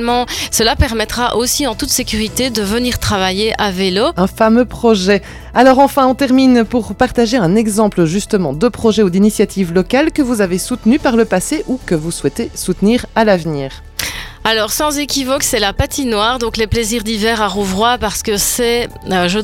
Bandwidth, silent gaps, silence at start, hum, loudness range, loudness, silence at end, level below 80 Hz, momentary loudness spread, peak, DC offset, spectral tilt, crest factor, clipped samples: 16.5 kHz; none; 0 s; none; 4 LU; -14 LUFS; 0 s; -32 dBFS; 7 LU; 0 dBFS; under 0.1%; -4 dB/octave; 14 dB; under 0.1%